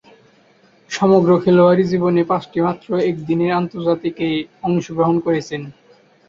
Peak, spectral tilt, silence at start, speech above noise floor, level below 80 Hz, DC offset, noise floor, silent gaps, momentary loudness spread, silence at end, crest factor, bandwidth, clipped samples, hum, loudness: -2 dBFS; -7.5 dB/octave; 0.9 s; 36 dB; -56 dBFS; under 0.1%; -53 dBFS; none; 9 LU; 0.6 s; 16 dB; 7.6 kHz; under 0.1%; none; -17 LUFS